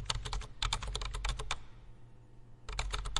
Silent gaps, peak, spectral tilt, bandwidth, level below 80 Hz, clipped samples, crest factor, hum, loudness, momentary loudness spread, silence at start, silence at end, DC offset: none; -14 dBFS; -2 dB/octave; 11.5 kHz; -42 dBFS; under 0.1%; 26 dB; none; -39 LUFS; 23 LU; 0 s; 0 s; under 0.1%